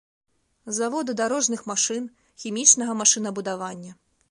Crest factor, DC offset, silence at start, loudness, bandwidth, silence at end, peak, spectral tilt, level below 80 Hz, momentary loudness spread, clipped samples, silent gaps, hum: 24 dB; under 0.1%; 0.65 s; -22 LUFS; 11.5 kHz; 0.35 s; -2 dBFS; -1.5 dB/octave; -74 dBFS; 18 LU; under 0.1%; none; none